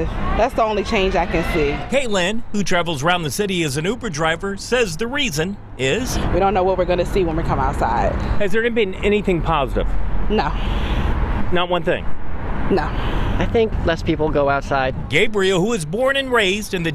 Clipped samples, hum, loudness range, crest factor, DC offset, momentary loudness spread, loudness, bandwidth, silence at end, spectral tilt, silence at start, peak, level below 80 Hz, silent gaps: under 0.1%; none; 3 LU; 14 dB; under 0.1%; 6 LU; -20 LUFS; 15 kHz; 0 s; -5 dB/octave; 0 s; -4 dBFS; -26 dBFS; none